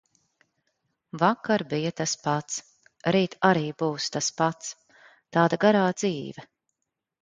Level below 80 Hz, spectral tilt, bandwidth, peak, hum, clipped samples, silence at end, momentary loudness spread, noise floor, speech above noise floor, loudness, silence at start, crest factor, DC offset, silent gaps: -68 dBFS; -4.5 dB/octave; 9.6 kHz; -4 dBFS; none; under 0.1%; 0.75 s; 14 LU; -83 dBFS; 59 dB; -25 LUFS; 1.15 s; 24 dB; under 0.1%; none